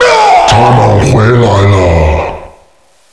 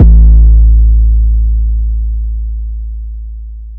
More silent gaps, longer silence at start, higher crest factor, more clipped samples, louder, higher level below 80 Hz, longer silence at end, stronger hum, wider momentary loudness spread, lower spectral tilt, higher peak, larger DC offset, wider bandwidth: neither; about the same, 0 s vs 0 s; about the same, 6 dB vs 8 dB; second, 2% vs 5%; first, -6 LUFS vs -11 LUFS; second, -20 dBFS vs -8 dBFS; first, 0.65 s vs 0 s; neither; second, 8 LU vs 18 LU; second, -6 dB/octave vs -13.5 dB/octave; about the same, 0 dBFS vs 0 dBFS; neither; first, 11 kHz vs 0.7 kHz